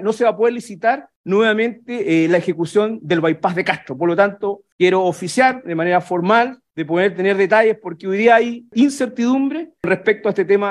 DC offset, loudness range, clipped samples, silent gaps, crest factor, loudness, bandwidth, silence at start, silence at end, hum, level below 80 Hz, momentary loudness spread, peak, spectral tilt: under 0.1%; 2 LU; under 0.1%; 1.16-1.24 s, 4.72-4.79 s; 16 dB; -17 LUFS; 12.5 kHz; 0 s; 0 s; none; -64 dBFS; 8 LU; 0 dBFS; -5.5 dB/octave